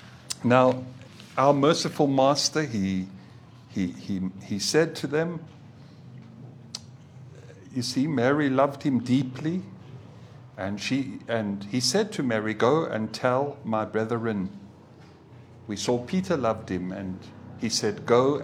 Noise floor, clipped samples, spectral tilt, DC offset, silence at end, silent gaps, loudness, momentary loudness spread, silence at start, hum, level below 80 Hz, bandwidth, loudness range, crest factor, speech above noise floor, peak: -50 dBFS; under 0.1%; -5 dB/octave; under 0.1%; 0 s; none; -26 LUFS; 23 LU; 0 s; none; -68 dBFS; 16 kHz; 6 LU; 22 dB; 25 dB; -4 dBFS